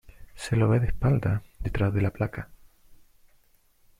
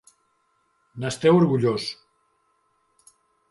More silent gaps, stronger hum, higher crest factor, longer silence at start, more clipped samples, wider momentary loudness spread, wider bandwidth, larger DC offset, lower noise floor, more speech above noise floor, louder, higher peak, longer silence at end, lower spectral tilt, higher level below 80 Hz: neither; neither; about the same, 16 dB vs 20 dB; second, 0.2 s vs 0.95 s; neither; second, 15 LU vs 22 LU; first, 13 kHz vs 11.5 kHz; neither; second, -62 dBFS vs -69 dBFS; second, 38 dB vs 48 dB; second, -27 LUFS vs -22 LUFS; second, -10 dBFS vs -6 dBFS; about the same, 1.45 s vs 1.55 s; first, -8 dB/octave vs -6.5 dB/octave; first, -40 dBFS vs -64 dBFS